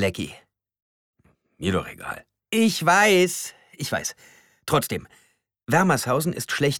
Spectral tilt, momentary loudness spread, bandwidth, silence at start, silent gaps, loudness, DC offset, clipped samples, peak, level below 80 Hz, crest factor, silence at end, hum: -4 dB/octave; 18 LU; 20 kHz; 0 s; 0.82-1.13 s; -22 LUFS; under 0.1%; under 0.1%; -6 dBFS; -56 dBFS; 18 dB; 0 s; none